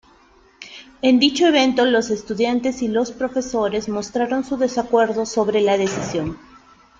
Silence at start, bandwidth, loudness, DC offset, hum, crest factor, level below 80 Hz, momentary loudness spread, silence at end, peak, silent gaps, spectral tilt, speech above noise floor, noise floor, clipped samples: 0.6 s; 7.8 kHz; -19 LUFS; under 0.1%; none; 16 dB; -52 dBFS; 10 LU; 0.65 s; -2 dBFS; none; -4 dB/octave; 34 dB; -53 dBFS; under 0.1%